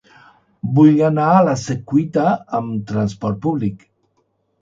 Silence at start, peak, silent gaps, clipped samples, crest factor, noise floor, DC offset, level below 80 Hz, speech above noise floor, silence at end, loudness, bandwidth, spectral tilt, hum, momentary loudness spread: 0.65 s; 0 dBFS; none; under 0.1%; 18 dB; -66 dBFS; under 0.1%; -52 dBFS; 49 dB; 0.85 s; -17 LUFS; 7.8 kHz; -8 dB/octave; none; 11 LU